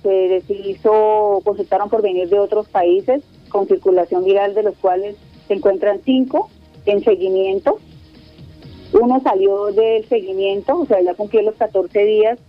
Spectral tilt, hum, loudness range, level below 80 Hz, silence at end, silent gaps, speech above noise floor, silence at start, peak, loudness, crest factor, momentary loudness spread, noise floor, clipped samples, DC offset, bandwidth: -8 dB/octave; none; 2 LU; -52 dBFS; 0.15 s; none; 27 dB; 0.05 s; -2 dBFS; -17 LUFS; 14 dB; 6 LU; -43 dBFS; under 0.1%; under 0.1%; 5.4 kHz